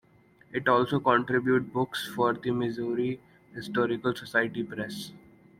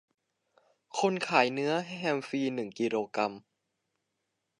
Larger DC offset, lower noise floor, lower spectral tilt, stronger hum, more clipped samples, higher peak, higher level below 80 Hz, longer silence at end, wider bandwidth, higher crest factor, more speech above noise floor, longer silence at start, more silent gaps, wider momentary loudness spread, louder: neither; second, -60 dBFS vs -83 dBFS; first, -6 dB/octave vs -4.5 dB/octave; neither; neither; about the same, -8 dBFS vs -8 dBFS; first, -66 dBFS vs -84 dBFS; second, 0.4 s vs 1.2 s; first, 16 kHz vs 11 kHz; about the same, 22 dB vs 24 dB; second, 32 dB vs 52 dB; second, 0.5 s vs 0.95 s; neither; first, 13 LU vs 8 LU; first, -28 LUFS vs -31 LUFS